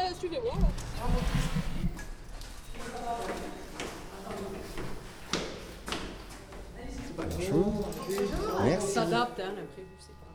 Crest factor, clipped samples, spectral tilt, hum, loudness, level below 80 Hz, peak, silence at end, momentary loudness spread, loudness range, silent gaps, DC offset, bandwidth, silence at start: 20 dB; under 0.1%; -5.5 dB/octave; none; -34 LUFS; -38 dBFS; -14 dBFS; 0 s; 17 LU; 8 LU; none; under 0.1%; over 20 kHz; 0 s